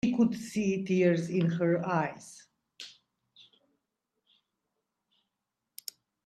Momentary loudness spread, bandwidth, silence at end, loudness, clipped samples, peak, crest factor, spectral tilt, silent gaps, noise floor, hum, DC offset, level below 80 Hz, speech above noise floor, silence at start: 21 LU; 14.5 kHz; 3.35 s; -29 LUFS; under 0.1%; -14 dBFS; 18 dB; -6.5 dB/octave; none; -86 dBFS; none; under 0.1%; -70 dBFS; 58 dB; 0.05 s